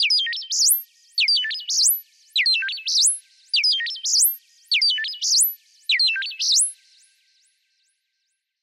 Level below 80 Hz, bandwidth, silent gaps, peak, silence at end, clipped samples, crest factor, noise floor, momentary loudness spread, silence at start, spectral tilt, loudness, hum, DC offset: under -90 dBFS; 16 kHz; none; -8 dBFS; 1.9 s; under 0.1%; 16 dB; -76 dBFS; 6 LU; 0 s; 13.5 dB/octave; -19 LUFS; none; under 0.1%